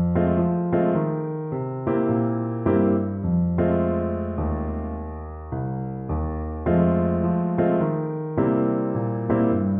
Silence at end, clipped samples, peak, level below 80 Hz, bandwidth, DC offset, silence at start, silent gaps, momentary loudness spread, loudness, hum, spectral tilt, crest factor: 0 s; under 0.1%; -8 dBFS; -38 dBFS; 3.4 kHz; under 0.1%; 0 s; none; 8 LU; -24 LUFS; none; -13 dB/octave; 14 dB